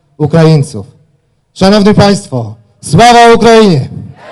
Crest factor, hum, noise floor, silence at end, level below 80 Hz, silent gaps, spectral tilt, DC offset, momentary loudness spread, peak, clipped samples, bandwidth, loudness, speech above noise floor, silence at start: 8 dB; none; -53 dBFS; 0 s; -34 dBFS; none; -6 dB/octave; under 0.1%; 21 LU; 0 dBFS; 4%; 12 kHz; -6 LUFS; 48 dB; 0.2 s